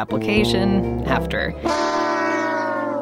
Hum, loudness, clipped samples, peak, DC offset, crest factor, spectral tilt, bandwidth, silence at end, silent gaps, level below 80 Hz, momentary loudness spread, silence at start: none; -20 LUFS; under 0.1%; -4 dBFS; under 0.1%; 16 dB; -5.5 dB/octave; 16 kHz; 0 s; none; -36 dBFS; 5 LU; 0 s